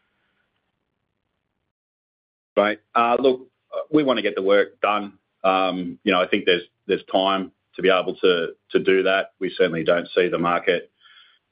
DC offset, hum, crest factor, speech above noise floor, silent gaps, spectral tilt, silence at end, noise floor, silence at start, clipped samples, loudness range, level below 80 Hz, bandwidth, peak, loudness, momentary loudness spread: under 0.1%; none; 20 dB; 55 dB; none; -9 dB/octave; 0.7 s; -76 dBFS; 2.55 s; under 0.1%; 4 LU; -66 dBFS; 5.2 kHz; -4 dBFS; -21 LUFS; 7 LU